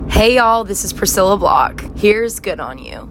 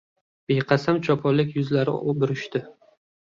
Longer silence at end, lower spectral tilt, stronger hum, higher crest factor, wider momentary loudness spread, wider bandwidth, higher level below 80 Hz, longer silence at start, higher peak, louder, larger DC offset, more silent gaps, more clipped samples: second, 0 s vs 0.5 s; second, -3.5 dB/octave vs -7.5 dB/octave; neither; about the same, 14 dB vs 18 dB; first, 13 LU vs 7 LU; first, 16.5 kHz vs 7.4 kHz; first, -28 dBFS vs -62 dBFS; second, 0 s vs 0.5 s; first, 0 dBFS vs -6 dBFS; first, -14 LUFS vs -23 LUFS; neither; neither; neither